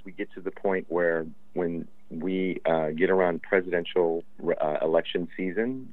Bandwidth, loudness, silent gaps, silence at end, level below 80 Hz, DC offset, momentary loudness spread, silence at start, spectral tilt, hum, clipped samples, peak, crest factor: 4.2 kHz; -28 LUFS; none; 0 s; -68 dBFS; 0.9%; 11 LU; 0.05 s; -8.5 dB/octave; none; under 0.1%; -10 dBFS; 18 dB